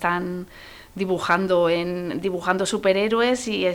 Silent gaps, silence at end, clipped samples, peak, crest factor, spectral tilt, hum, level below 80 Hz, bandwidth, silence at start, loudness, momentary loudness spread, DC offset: none; 0 s; under 0.1%; -6 dBFS; 16 dB; -4.5 dB/octave; none; -54 dBFS; 19 kHz; 0 s; -22 LUFS; 13 LU; under 0.1%